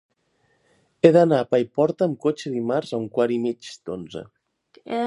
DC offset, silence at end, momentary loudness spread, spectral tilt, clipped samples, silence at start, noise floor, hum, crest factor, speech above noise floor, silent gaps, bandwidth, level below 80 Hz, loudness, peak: under 0.1%; 0 s; 17 LU; -7 dB/octave; under 0.1%; 1.05 s; -67 dBFS; none; 22 dB; 46 dB; none; 11 kHz; -66 dBFS; -21 LUFS; -2 dBFS